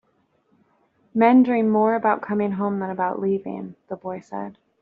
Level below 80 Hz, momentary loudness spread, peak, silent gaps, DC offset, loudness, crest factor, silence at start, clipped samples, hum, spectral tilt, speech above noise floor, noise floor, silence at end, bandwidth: -70 dBFS; 17 LU; -4 dBFS; none; under 0.1%; -21 LUFS; 20 dB; 1.15 s; under 0.1%; none; -7 dB/octave; 45 dB; -66 dBFS; 0.3 s; 4.5 kHz